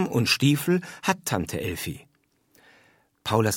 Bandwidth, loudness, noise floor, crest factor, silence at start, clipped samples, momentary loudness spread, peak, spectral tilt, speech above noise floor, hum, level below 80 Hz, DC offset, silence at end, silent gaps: 18.5 kHz; -25 LUFS; -66 dBFS; 20 dB; 0 s; under 0.1%; 14 LU; -6 dBFS; -4.5 dB/octave; 42 dB; none; -56 dBFS; under 0.1%; 0 s; none